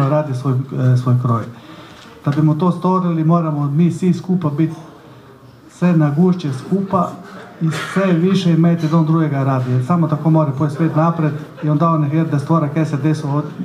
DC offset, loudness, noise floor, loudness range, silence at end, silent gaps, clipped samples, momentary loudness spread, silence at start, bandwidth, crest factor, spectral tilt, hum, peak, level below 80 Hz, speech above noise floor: under 0.1%; -16 LUFS; -42 dBFS; 3 LU; 0 s; none; under 0.1%; 7 LU; 0 s; 11 kHz; 14 dB; -8.5 dB/octave; none; -2 dBFS; -60 dBFS; 26 dB